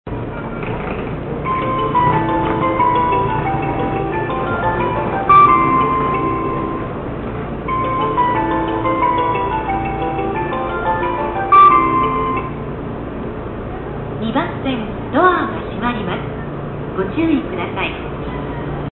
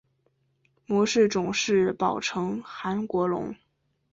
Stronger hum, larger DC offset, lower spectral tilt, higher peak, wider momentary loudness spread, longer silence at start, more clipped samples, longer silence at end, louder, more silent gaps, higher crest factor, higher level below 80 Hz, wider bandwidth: neither; neither; first, -12 dB/octave vs -4.5 dB/octave; first, -2 dBFS vs -10 dBFS; first, 13 LU vs 10 LU; second, 0.05 s vs 0.9 s; neither; second, 0 s vs 0.6 s; first, -17 LUFS vs -26 LUFS; neither; about the same, 16 dB vs 18 dB; first, -34 dBFS vs -62 dBFS; second, 4.2 kHz vs 7.8 kHz